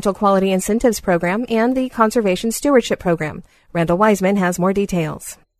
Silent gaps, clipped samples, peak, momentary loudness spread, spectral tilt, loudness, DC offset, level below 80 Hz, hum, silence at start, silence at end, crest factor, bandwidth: none; under 0.1%; 0 dBFS; 7 LU; -5.5 dB/octave; -17 LUFS; under 0.1%; -44 dBFS; none; 0 s; 0.25 s; 16 dB; 13.5 kHz